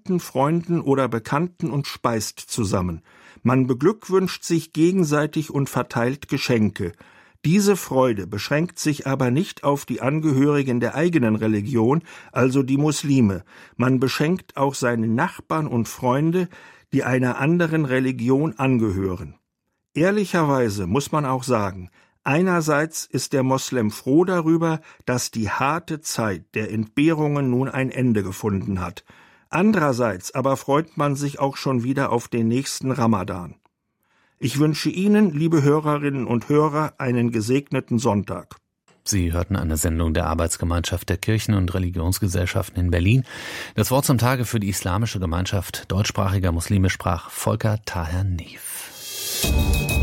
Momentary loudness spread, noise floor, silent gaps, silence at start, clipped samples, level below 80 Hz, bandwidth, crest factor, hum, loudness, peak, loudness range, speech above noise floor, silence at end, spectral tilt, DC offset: 7 LU; -77 dBFS; none; 0.05 s; under 0.1%; -42 dBFS; 16.5 kHz; 16 dB; none; -22 LUFS; -4 dBFS; 3 LU; 56 dB; 0 s; -6 dB/octave; under 0.1%